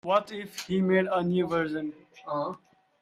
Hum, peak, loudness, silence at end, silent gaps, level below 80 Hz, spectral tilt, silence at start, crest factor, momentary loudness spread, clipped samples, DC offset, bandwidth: none; -10 dBFS; -29 LUFS; 0.45 s; none; -66 dBFS; -6.5 dB/octave; 0.05 s; 18 dB; 14 LU; under 0.1%; under 0.1%; 14 kHz